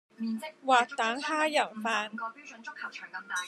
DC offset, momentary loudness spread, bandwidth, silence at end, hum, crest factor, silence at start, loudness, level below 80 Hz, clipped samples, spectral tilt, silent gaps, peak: under 0.1%; 15 LU; 14 kHz; 0 s; none; 20 dB; 0.2 s; -30 LUFS; under -90 dBFS; under 0.1%; -2.5 dB/octave; none; -10 dBFS